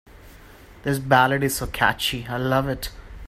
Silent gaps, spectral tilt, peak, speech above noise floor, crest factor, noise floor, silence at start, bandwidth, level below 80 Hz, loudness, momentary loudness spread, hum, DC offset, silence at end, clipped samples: none; -4.5 dB/octave; -2 dBFS; 24 dB; 22 dB; -46 dBFS; 0.1 s; 16 kHz; -42 dBFS; -22 LUFS; 13 LU; none; under 0.1%; 0 s; under 0.1%